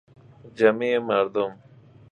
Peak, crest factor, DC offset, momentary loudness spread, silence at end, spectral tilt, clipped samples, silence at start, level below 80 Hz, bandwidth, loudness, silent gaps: -4 dBFS; 22 dB; under 0.1%; 8 LU; 0.6 s; -6.5 dB/octave; under 0.1%; 0.45 s; -68 dBFS; 8 kHz; -23 LUFS; none